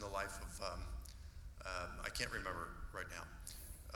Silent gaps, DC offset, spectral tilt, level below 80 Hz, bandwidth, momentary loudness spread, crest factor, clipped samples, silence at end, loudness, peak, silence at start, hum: none; under 0.1%; -3 dB/octave; -52 dBFS; 19.5 kHz; 11 LU; 26 dB; under 0.1%; 0 s; -47 LUFS; -20 dBFS; 0 s; none